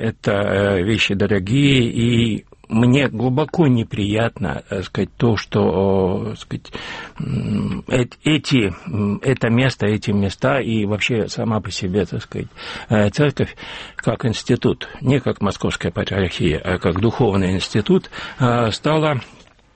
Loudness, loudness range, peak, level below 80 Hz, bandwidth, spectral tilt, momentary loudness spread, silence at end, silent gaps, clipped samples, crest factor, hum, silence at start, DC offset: -19 LUFS; 4 LU; -4 dBFS; -42 dBFS; 8.8 kHz; -6.5 dB/octave; 9 LU; 0.45 s; none; under 0.1%; 16 dB; none; 0 s; under 0.1%